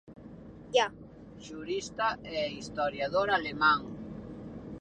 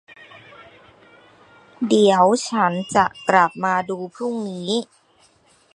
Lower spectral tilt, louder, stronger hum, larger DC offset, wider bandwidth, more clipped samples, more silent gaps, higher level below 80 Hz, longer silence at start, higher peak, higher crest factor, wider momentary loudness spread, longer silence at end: about the same, -4 dB/octave vs -4.5 dB/octave; second, -30 LUFS vs -19 LUFS; neither; neither; second, 10 kHz vs 11.5 kHz; neither; neither; first, -58 dBFS vs -64 dBFS; second, 0.05 s vs 0.35 s; second, -12 dBFS vs 0 dBFS; about the same, 20 dB vs 20 dB; first, 23 LU vs 12 LU; second, 0 s vs 0.9 s